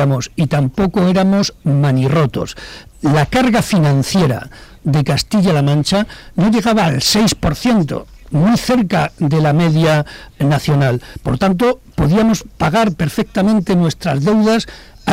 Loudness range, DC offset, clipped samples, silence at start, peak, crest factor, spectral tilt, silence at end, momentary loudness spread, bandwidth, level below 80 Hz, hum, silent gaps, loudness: 1 LU; under 0.1%; under 0.1%; 0 s; -6 dBFS; 8 dB; -6 dB/octave; 0 s; 9 LU; 16 kHz; -36 dBFS; none; none; -15 LUFS